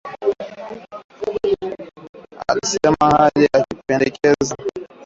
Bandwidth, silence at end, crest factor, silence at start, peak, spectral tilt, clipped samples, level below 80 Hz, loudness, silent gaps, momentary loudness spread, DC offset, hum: 7.8 kHz; 0 s; 16 dB; 0.05 s; -2 dBFS; -4.5 dB/octave; under 0.1%; -48 dBFS; -18 LUFS; 1.04-1.09 s, 2.09-2.13 s; 20 LU; under 0.1%; none